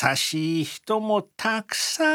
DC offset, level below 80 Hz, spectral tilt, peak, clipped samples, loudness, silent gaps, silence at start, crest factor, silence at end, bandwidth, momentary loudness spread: under 0.1%; -76 dBFS; -3 dB/octave; -6 dBFS; under 0.1%; -25 LUFS; none; 0 s; 20 dB; 0 s; 19.5 kHz; 5 LU